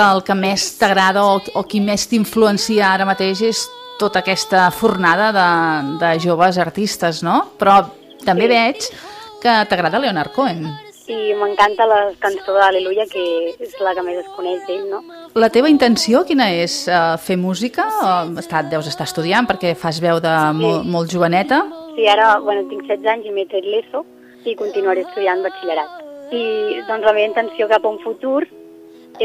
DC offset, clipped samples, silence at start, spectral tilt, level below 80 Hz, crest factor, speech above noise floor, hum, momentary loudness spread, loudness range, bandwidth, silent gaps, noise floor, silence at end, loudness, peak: under 0.1%; under 0.1%; 0 s; -4.5 dB/octave; -56 dBFS; 16 dB; 25 dB; none; 11 LU; 4 LU; 15.5 kHz; none; -41 dBFS; 0 s; -16 LUFS; 0 dBFS